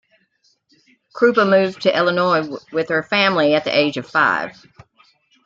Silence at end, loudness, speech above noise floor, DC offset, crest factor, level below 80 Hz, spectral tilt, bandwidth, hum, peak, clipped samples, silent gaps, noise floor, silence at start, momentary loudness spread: 0.95 s; -17 LUFS; 46 dB; under 0.1%; 18 dB; -62 dBFS; -5.5 dB/octave; 7.6 kHz; none; -2 dBFS; under 0.1%; none; -63 dBFS; 1.15 s; 7 LU